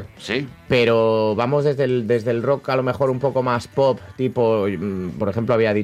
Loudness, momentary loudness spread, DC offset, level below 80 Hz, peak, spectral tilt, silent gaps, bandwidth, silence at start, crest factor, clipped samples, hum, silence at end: -20 LUFS; 8 LU; under 0.1%; -52 dBFS; -6 dBFS; -7 dB/octave; none; 13 kHz; 0 s; 14 dB; under 0.1%; none; 0 s